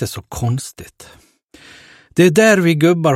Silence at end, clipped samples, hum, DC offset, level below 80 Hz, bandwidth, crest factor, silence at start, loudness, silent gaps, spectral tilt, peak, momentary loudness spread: 0 s; under 0.1%; none; under 0.1%; -46 dBFS; 16.5 kHz; 16 dB; 0 s; -14 LUFS; 1.44-1.48 s; -5.5 dB/octave; 0 dBFS; 14 LU